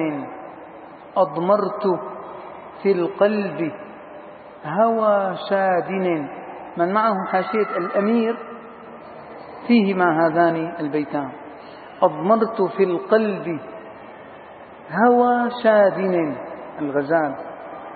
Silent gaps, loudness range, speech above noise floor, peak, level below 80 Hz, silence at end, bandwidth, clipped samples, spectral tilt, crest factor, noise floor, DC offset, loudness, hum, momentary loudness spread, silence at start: none; 3 LU; 21 dB; -2 dBFS; -68 dBFS; 0 s; 4.7 kHz; under 0.1%; -11.5 dB/octave; 18 dB; -41 dBFS; under 0.1%; -20 LUFS; none; 22 LU; 0 s